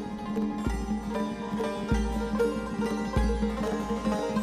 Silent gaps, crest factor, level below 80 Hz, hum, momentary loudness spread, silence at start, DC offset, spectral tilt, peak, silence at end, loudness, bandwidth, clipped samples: none; 16 dB; -36 dBFS; none; 4 LU; 0 s; under 0.1%; -6.5 dB/octave; -14 dBFS; 0 s; -30 LUFS; 14.5 kHz; under 0.1%